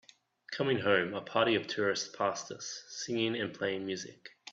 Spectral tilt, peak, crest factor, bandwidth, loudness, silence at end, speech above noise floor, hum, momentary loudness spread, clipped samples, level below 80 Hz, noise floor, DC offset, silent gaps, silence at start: -3.5 dB/octave; -12 dBFS; 20 dB; 8 kHz; -33 LUFS; 0 s; 19 dB; none; 12 LU; under 0.1%; -76 dBFS; -52 dBFS; under 0.1%; none; 0.5 s